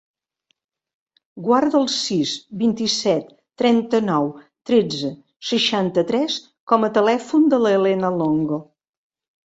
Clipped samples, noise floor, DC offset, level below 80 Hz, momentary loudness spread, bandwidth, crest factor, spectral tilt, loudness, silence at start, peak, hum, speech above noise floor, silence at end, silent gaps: under 0.1%; -71 dBFS; under 0.1%; -64 dBFS; 10 LU; 8.2 kHz; 18 dB; -5 dB/octave; -20 LUFS; 1.35 s; -2 dBFS; none; 52 dB; 0.8 s; 5.36-5.40 s, 6.60-6.67 s